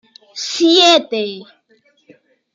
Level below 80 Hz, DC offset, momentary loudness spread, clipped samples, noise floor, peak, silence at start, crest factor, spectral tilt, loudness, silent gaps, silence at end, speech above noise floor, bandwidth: -74 dBFS; under 0.1%; 22 LU; under 0.1%; -57 dBFS; 0 dBFS; 0.35 s; 16 dB; -2 dB/octave; -13 LUFS; none; 1.1 s; 43 dB; 7.6 kHz